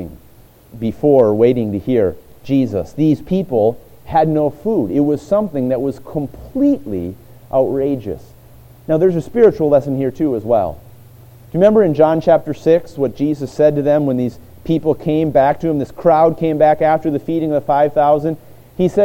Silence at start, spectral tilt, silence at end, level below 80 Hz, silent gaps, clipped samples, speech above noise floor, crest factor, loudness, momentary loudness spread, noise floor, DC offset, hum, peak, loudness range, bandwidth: 0 s; -9 dB/octave; 0 s; -44 dBFS; none; under 0.1%; 30 dB; 16 dB; -16 LUFS; 12 LU; -45 dBFS; under 0.1%; none; 0 dBFS; 4 LU; 17 kHz